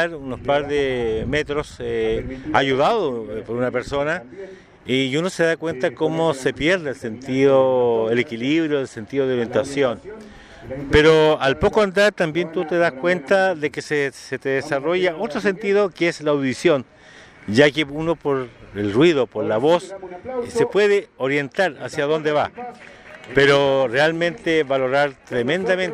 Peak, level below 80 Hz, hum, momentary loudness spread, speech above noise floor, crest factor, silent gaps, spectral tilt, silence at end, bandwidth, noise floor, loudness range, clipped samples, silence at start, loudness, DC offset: 0 dBFS; -44 dBFS; none; 12 LU; 25 dB; 20 dB; none; -5.5 dB/octave; 0 s; 12 kHz; -45 dBFS; 4 LU; under 0.1%; 0 s; -20 LUFS; under 0.1%